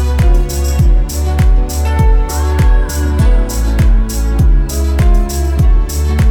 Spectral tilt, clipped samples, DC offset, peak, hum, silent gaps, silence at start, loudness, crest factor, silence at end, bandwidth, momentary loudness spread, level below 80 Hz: -6 dB/octave; under 0.1%; under 0.1%; 0 dBFS; none; none; 0 s; -13 LUFS; 10 dB; 0 s; 19 kHz; 3 LU; -10 dBFS